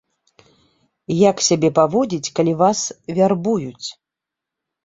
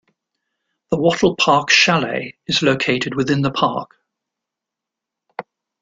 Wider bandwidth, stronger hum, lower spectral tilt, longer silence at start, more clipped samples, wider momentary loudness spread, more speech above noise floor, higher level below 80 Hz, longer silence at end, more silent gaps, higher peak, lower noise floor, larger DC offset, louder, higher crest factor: second, 8.2 kHz vs 9.4 kHz; neither; about the same, -5 dB/octave vs -4 dB/octave; first, 1.1 s vs 0.9 s; neither; second, 10 LU vs 19 LU; about the same, 67 dB vs 67 dB; about the same, -60 dBFS vs -56 dBFS; first, 0.95 s vs 0.4 s; neither; about the same, -2 dBFS vs 0 dBFS; about the same, -85 dBFS vs -84 dBFS; neither; about the same, -18 LUFS vs -16 LUFS; about the same, 18 dB vs 20 dB